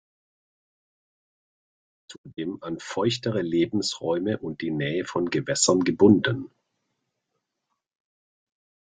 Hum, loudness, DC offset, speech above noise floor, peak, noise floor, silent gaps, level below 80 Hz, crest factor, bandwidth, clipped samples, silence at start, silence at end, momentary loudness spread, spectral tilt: none; -24 LUFS; under 0.1%; 56 dB; -4 dBFS; -81 dBFS; 2.18-2.24 s; -64 dBFS; 22 dB; 9.6 kHz; under 0.1%; 2.1 s; 2.35 s; 15 LU; -4.5 dB/octave